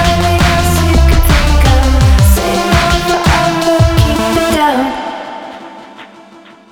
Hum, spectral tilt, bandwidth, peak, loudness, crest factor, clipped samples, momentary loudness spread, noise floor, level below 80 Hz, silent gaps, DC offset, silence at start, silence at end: none; -5 dB/octave; 19.5 kHz; 0 dBFS; -10 LUFS; 10 dB; 0.1%; 14 LU; -38 dBFS; -14 dBFS; none; under 0.1%; 0 s; 0.65 s